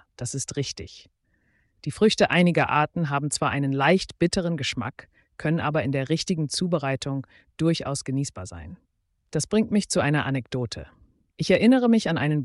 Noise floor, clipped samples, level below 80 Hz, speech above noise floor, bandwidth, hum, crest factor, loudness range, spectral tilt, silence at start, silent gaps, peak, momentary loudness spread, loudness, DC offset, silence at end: -67 dBFS; under 0.1%; -54 dBFS; 44 dB; 11.5 kHz; none; 16 dB; 5 LU; -5 dB/octave; 0.2 s; none; -8 dBFS; 15 LU; -24 LUFS; under 0.1%; 0 s